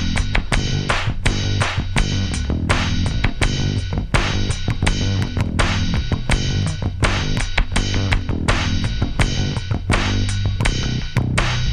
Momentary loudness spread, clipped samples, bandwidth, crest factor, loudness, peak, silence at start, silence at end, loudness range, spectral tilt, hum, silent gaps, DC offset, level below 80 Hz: 3 LU; under 0.1%; 11.5 kHz; 18 dB; -20 LUFS; 0 dBFS; 0 s; 0 s; 0 LU; -5 dB/octave; none; none; under 0.1%; -24 dBFS